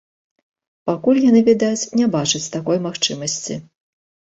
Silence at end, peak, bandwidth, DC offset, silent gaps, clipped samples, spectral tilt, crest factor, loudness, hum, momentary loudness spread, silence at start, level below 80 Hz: 0.75 s; -4 dBFS; 8 kHz; under 0.1%; none; under 0.1%; -4 dB/octave; 16 dB; -18 LUFS; none; 12 LU; 0.85 s; -60 dBFS